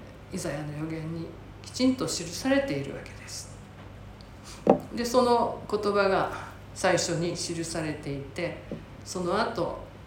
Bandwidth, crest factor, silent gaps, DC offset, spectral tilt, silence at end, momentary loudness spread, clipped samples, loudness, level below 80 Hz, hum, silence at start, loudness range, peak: 17 kHz; 26 dB; none; under 0.1%; -4.5 dB/octave; 0 s; 18 LU; under 0.1%; -29 LUFS; -52 dBFS; none; 0 s; 4 LU; -4 dBFS